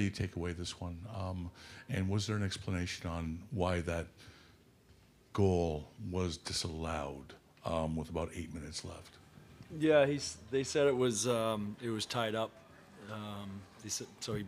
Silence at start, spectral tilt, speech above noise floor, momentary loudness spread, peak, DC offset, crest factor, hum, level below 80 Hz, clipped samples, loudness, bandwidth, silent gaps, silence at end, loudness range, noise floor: 0 s; -5 dB/octave; 28 dB; 17 LU; -14 dBFS; under 0.1%; 22 dB; none; -60 dBFS; under 0.1%; -36 LUFS; 15.5 kHz; none; 0 s; 6 LU; -63 dBFS